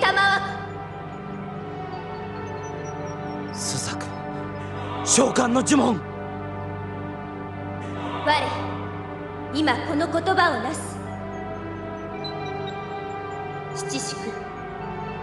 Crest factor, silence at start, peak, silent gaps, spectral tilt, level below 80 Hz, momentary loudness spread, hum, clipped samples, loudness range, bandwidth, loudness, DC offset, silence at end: 22 dB; 0 s; -6 dBFS; none; -3.5 dB/octave; -52 dBFS; 14 LU; none; under 0.1%; 8 LU; 12.5 kHz; -26 LUFS; under 0.1%; 0 s